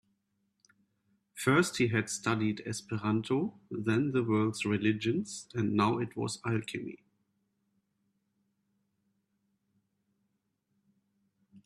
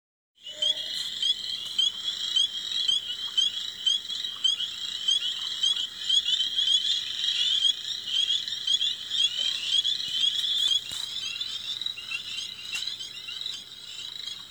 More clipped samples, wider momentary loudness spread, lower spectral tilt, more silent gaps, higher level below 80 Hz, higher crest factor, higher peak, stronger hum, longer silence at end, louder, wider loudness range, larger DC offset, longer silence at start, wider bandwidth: neither; about the same, 10 LU vs 11 LU; first, -5.5 dB/octave vs 2 dB/octave; neither; about the same, -70 dBFS vs -70 dBFS; about the same, 20 dB vs 18 dB; about the same, -14 dBFS vs -12 dBFS; neither; about the same, 0.05 s vs 0 s; second, -31 LUFS vs -25 LUFS; first, 10 LU vs 5 LU; neither; first, 1.35 s vs 0.4 s; second, 14 kHz vs over 20 kHz